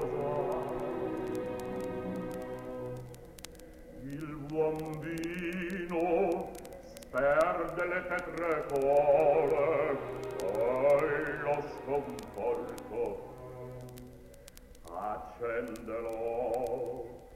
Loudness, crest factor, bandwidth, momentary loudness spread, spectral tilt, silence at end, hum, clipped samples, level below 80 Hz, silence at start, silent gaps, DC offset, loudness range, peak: -33 LUFS; 18 dB; 16 kHz; 20 LU; -6.5 dB/octave; 0 s; none; under 0.1%; -56 dBFS; 0 s; none; under 0.1%; 11 LU; -14 dBFS